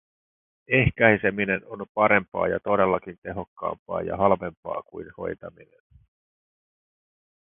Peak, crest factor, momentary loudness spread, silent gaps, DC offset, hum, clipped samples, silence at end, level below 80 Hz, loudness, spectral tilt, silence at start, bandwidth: 0 dBFS; 26 dB; 16 LU; 1.89-1.95 s, 2.28-2.32 s, 3.18-3.22 s, 3.47-3.56 s, 3.79-3.86 s, 4.57-4.63 s; under 0.1%; none; under 0.1%; 2 s; -50 dBFS; -24 LUFS; -11 dB/octave; 0.7 s; 3.8 kHz